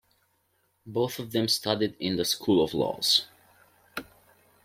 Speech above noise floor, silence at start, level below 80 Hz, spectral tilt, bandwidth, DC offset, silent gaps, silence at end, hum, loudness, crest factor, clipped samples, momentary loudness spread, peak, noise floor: 45 dB; 0.85 s; -64 dBFS; -4 dB/octave; 16.5 kHz; under 0.1%; none; 0.6 s; none; -26 LUFS; 22 dB; under 0.1%; 17 LU; -8 dBFS; -72 dBFS